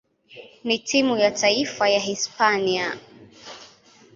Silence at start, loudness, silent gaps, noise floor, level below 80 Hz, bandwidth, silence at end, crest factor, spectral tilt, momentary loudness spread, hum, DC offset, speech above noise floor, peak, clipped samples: 0.3 s; -21 LUFS; none; -52 dBFS; -66 dBFS; 7.8 kHz; 0.5 s; 20 dB; -2.5 dB/octave; 22 LU; none; under 0.1%; 30 dB; -4 dBFS; under 0.1%